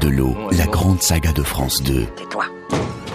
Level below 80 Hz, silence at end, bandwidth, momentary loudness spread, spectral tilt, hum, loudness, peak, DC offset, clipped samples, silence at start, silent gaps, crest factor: -26 dBFS; 0 s; 15.5 kHz; 8 LU; -4.5 dB/octave; none; -19 LUFS; -4 dBFS; under 0.1%; under 0.1%; 0 s; none; 14 dB